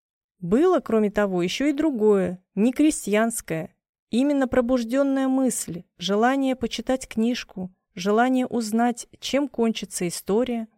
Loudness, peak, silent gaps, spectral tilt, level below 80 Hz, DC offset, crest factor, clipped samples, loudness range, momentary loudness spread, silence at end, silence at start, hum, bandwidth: -23 LUFS; -8 dBFS; 3.89-3.93 s, 3.99-4.07 s; -5 dB/octave; -54 dBFS; under 0.1%; 16 dB; under 0.1%; 3 LU; 10 LU; 0.15 s; 0.4 s; none; 16.5 kHz